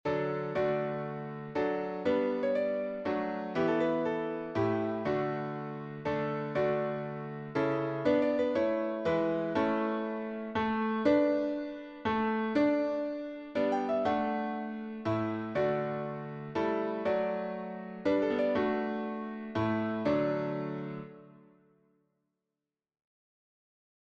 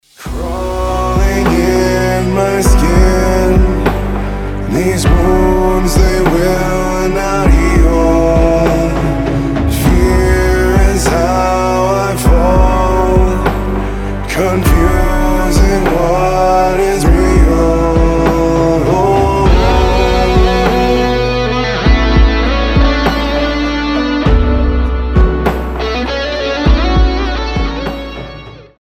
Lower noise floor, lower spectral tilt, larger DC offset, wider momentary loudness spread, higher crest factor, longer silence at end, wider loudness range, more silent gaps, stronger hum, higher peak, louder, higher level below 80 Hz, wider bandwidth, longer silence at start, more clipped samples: first, -90 dBFS vs -31 dBFS; first, -8 dB/octave vs -6 dB/octave; neither; about the same, 9 LU vs 7 LU; first, 18 dB vs 10 dB; first, 2.65 s vs 0.2 s; about the same, 4 LU vs 3 LU; neither; neither; second, -14 dBFS vs 0 dBFS; second, -32 LUFS vs -12 LUFS; second, -66 dBFS vs -14 dBFS; second, 7.4 kHz vs 15.5 kHz; second, 0.05 s vs 0.2 s; neither